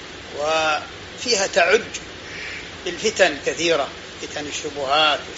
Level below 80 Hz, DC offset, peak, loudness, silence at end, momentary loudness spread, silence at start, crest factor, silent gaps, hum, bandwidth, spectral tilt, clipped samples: -52 dBFS; under 0.1%; -2 dBFS; -21 LUFS; 0 s; 14 LU; 0 s; 20 dB; none; none; 8 kHz; -0.5 dB/octave; under 0.1%